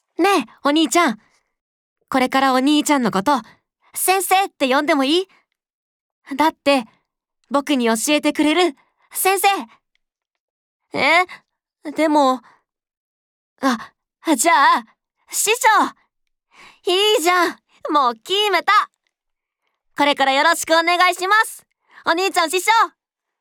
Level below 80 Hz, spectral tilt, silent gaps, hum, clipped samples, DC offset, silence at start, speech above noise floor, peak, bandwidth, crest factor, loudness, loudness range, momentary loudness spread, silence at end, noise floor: -68 dBFS; -2 dB/octave; 1.61-1.96 s, 5.73-6.22 s, 10.40-10.80 s, 12.97-13.56 s; none; under 0.1%; under 0.1%; 0.2 s; 63 dB; -4 dBFS; 19.5 kHz; 16 dB; -17 LUFS; 4 LU; 11 LU; 0.55 s; -80 dBFS